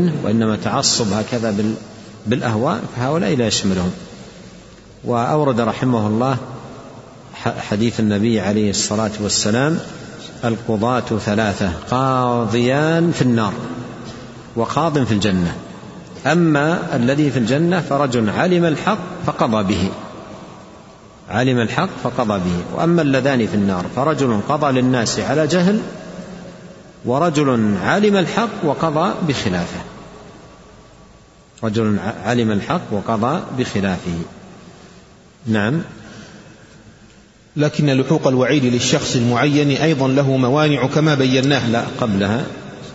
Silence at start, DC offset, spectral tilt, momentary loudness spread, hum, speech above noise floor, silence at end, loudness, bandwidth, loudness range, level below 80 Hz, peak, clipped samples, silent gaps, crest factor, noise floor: 0 s; under 0.1%; -5.5 dB/octave; 17 LU; none; 30 dB; 0 s; -18 LUFS; 8 kHz; 6 LU; -48 dBFS; 0 dBFS; under 0.1%; none; 18 dB; -47 dBFS